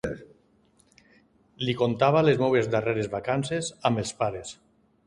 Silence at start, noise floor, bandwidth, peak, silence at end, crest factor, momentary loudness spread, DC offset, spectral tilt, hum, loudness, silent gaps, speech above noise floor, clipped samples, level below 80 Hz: 0.05 s; -63 dBFS; 11.5 kHz; -8 dBFS; 0.55 s; 20 dB; 13 LU; under 0.1%; -5.5 dB/octave; none; -25 LUFS; none; 38 dB; under 0.1%; -56 dBFS